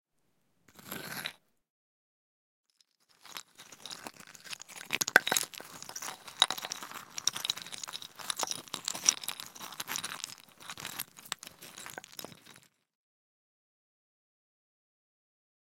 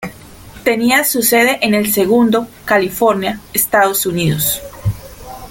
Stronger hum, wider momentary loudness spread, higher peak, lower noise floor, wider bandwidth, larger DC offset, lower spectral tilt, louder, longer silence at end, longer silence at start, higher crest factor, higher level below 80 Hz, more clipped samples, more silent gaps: neither; first, 18 LU vs 11 LU; about the same, 0 dBFS vs 0 dBFS; first, -77 dBFS vs -36 dBFS; about the same, 17 kHz vs 17 kHz; neither; second, 0.5 dB/octave vs -4 dB/octave; second, -34 LUFS vs -14 LUFS; first, 3.1 s vs 0 s; first, 0.75 s vs 0 s; first, 38 dB vs 14 dB; second, -82 dBFS vs -42 dBFS; neither; first, 1.70-2.64 s vs none